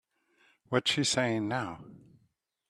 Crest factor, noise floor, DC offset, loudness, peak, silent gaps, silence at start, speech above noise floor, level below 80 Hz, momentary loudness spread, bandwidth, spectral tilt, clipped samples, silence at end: 22 dB; -74 dBFS; under 0.1%; -30 LUFS; -12 dBFS; none; 0.7 s; 43 dB; -70 dBFS; 12 LU; 13.5 kHz; -3.5 dB/octave; under 0.1%; 0.75 s